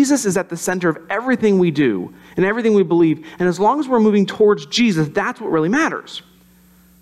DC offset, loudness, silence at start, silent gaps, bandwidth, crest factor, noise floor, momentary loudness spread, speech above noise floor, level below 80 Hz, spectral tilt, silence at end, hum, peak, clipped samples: under 0.1%; -17 LUFS; 0 s; none; 14.5 kHz; 12 dB; -50 dBFS; 7 LU; 33 dB; -58 dBFS; -5.5 dB/octave; 0.8 s; none; -4 dBFS; under 0.1%